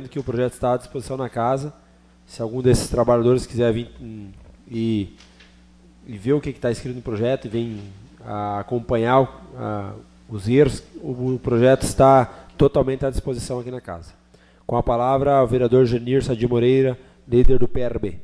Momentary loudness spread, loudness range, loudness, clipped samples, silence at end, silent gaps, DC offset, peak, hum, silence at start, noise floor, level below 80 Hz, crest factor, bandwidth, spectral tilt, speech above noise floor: 16 LU; 7 LU; -21 LUFS; under 0.1%; 0 s; none; under 0.1%; -4 dBFS; none; 0 s; -53 dBFS; -34 dBFS; 16 dB; 11 kHz; -7 dB/octave; 33 dB